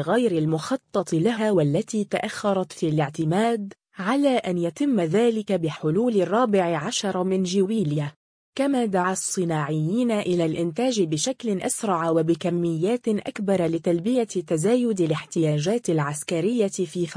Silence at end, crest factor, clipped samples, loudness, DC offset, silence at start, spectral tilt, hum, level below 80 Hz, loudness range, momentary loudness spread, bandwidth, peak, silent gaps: 0 s; 14 dB; under 0.1%; -24 LUFS; under 0.1%; 0 s; -5.5 dB/octave; none; -64 dBFS; 2 LU; 5 LU; 10.5 kHz; -10 dBFS; 8.16-8.53 s